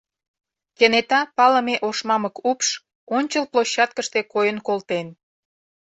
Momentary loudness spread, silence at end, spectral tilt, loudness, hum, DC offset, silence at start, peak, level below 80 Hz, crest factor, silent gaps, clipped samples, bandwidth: 9 LU; 0.75 s; -2.5 dB/octave; -20 LUFS; none; under 0.1%; 0.8 s; -2 dBFS; -70 dBFS; 20 dB; 2.95-3.07 s; under 0.1%; 8.2 kHz